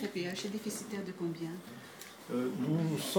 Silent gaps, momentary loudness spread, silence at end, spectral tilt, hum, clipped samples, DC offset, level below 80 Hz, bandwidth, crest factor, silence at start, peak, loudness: none; 15 LU; 0 s; -5 dB/octave; none; under 0.1%; under 0.1%; -84 dBFS; 19 kHz; 20 dB; 0 s; -18 dBFS; -37 LUFS